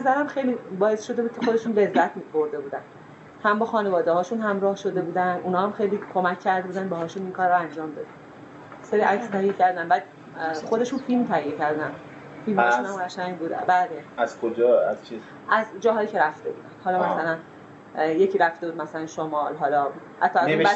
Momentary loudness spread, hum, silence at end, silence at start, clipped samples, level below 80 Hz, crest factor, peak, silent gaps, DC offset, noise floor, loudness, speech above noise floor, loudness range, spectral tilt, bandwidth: 13 LU; none; 0 s; 0 s; under 0.1%; -72 dBFS; 20 dB; -4 dBFS; none; under 0.1%; -43 dBFS; -24 LUFS; 20 dB; 2 LU; -6 dB/octave; 8.2 kHz